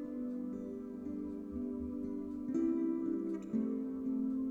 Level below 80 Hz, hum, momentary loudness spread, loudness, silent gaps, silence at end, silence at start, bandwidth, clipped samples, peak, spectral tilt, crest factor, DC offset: -62 dBFS; none; 8 LU; -39 LUFS; none; 0 s; 0 s; 7.4 kHz; under 0.1%; -24 dBFS; -9.5 dB/octave; 12 dB; under 0.1%